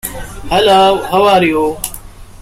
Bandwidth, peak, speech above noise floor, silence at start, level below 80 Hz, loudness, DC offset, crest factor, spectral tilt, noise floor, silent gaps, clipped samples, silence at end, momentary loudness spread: 16.5 kHz; 0 dBFS; 21 dB; 0.05 s; -34 dBFS; -11 LUFS; under 0.1%; 12 dB; -4 dB/octave; -31 dBFS; none; under 0.1%; 0.05 s; 16 LU